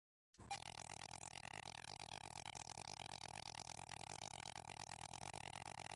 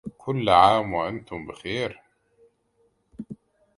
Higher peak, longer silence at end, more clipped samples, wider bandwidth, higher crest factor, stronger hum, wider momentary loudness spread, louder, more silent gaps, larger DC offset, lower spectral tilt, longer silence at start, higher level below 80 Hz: second, -34 dBFS vs -2 dBFS; second, 0 s vs 0.45 s; neither; about the same, 11.5 kHz vs 11.5 kHz; about the same, 20 dB vs 24 dB; neither; second, 2 LU vs 24 LU; second, -52 LUFS vs -23 LUFS; neither; neither; second, -2 dB/octave vs -6 dB/octave; first, 0.35 s vs 0.05 s; second, -72 dBFS vs -54 dBFS